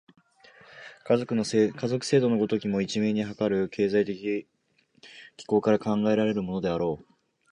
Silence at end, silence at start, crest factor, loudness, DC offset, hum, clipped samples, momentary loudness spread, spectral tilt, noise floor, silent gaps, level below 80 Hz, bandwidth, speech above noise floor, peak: 0.5 s; 0.75 s; 18 dB; -26 LUFS; under 0.1%; none; under 0.1%; 15 LU; -6 dB/octave; -67 dBFS; none; -62 dBFS; 11 kHz; 41 dB; -10 dBFS